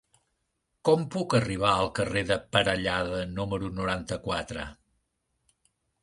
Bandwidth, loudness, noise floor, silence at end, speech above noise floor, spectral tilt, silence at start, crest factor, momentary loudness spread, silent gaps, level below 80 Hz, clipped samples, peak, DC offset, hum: 11.5 kHz; -28 LUFS; -78 dBFS; 1.3 s; 51 dB; -5 dB/octave; 0.85 s; 24 dB; 7 LU; none; -50 dBFS; under 0.1%; -6 dBFS; under 0.1%; none